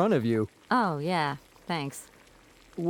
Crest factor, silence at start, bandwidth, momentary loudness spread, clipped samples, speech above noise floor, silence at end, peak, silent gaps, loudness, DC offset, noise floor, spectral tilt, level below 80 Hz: 18 dB; 0 s; 19.5 kHz; 15 LU; under 0.1%; 29 dB; 0 s; -10 dBFS; none; -29 LUFS; under 0.1%; -56 dBFS; -6 dB/octave; -64 dBFS